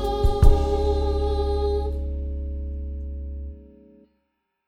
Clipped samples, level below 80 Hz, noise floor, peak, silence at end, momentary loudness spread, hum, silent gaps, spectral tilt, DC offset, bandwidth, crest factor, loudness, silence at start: under 0.1%; -24 dBFS; -75 dBFS; -2 dBFS; 1 s; 15 LU; none; none; -8 dB/octave; under 0.1%; 11 kHz; 22 dB; -25 LUFS; 0 s